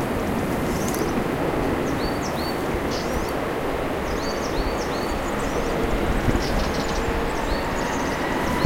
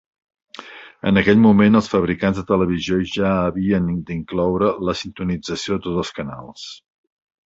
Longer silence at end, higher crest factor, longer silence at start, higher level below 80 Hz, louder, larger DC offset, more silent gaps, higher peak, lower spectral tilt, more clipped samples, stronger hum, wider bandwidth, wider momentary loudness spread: second, 0 s vs 0.7 s; about the same, 20 dB vs 18 dB; second, 0 s vs 0.6 s; first, -32 dBFS vs -44 dBFS; second, -25 LUFS vs -19 LUFS; neither; neither; about the same, -4 dBFS vs -2 dBFS; second, -5 dB/octave vs -6.5 dB/octave; neither; neither; first, 16.5 kHz vs 7.8 kHz; second, 2 LU vs 21 LU